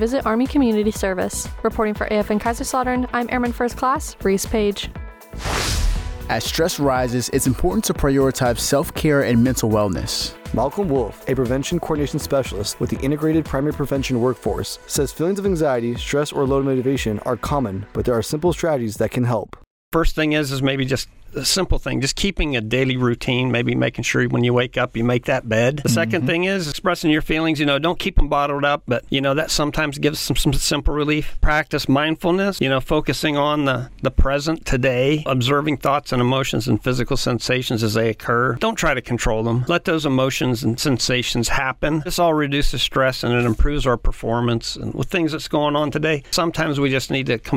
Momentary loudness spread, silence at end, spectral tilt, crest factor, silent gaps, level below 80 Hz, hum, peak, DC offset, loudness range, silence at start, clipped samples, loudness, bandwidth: 5 LU; 0 s; -5 dB/octave; 12 dB; 19.67-19.91 s; -30 dBFS; none; -6 dBFS; under 0.1%; 2 LU; 0 s; under 0.1%; -20 LUFS; 19.5 kHz